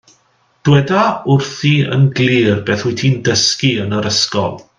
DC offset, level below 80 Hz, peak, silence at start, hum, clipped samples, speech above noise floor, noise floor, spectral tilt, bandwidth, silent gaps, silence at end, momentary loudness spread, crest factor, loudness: under 0.1%; -52 dBFS; 0 dBFS; 0.65 s; none; under 0.1%; 43 dB; -57 dBFS; -5 dB/octave; 9.4 kHz; none; 0.2 s; 4 LU; 14 dB; -14 LUFS